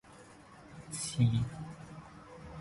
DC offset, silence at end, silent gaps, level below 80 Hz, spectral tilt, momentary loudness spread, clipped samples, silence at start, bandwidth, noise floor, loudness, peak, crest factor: under 0.1%; 0 s; none; -58 dBFS; -5.5 dB/octave; 25 LU; under 0.1%; 0.05 s; 11.5 kHz; -56 dBFS; -34 LUFS; -16 dBFS; 20 dB